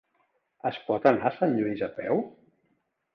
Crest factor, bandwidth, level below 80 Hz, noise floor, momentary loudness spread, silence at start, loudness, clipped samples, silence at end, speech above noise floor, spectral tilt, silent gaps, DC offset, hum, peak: 22 dB; 6.4 kHz; -68 dBFS; -74 dBFS; 10 LU; 0.65 s; -27 LUFS; under 0.1%; 0.85 s; 47 dB; -8.5 dB/octave; none; under 0.1%; none; -8 dBFS